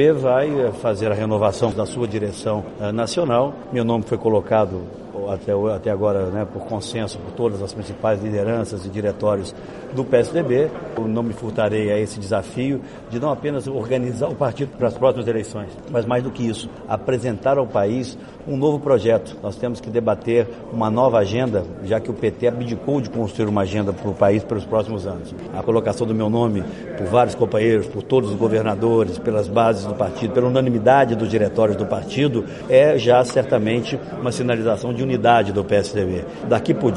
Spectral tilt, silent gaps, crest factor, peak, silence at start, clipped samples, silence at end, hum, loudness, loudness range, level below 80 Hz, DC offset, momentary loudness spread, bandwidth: -7 dB/octave; none; 18 dB; -2 dBFS; 0 s; under 0.1%; 0 s; none; -20 LUFS; 5 LU; -48 dBFS; under 0.1%; 10 LU; 11.5 kHz